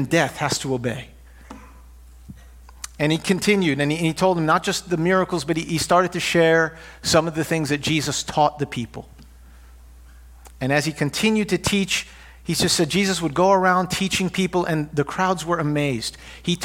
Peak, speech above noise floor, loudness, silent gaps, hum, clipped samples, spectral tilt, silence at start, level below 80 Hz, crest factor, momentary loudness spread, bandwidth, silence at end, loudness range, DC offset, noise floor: -2 dBFS; 24 dB; -21 LUFS; none; none; under 0.1%; -4.5 dB/octave; 0 s; -46 dBFS; 20 dB; 10 LU; 17 kHz; 0 s; 5 LU; under 0.1%; -45 dBFS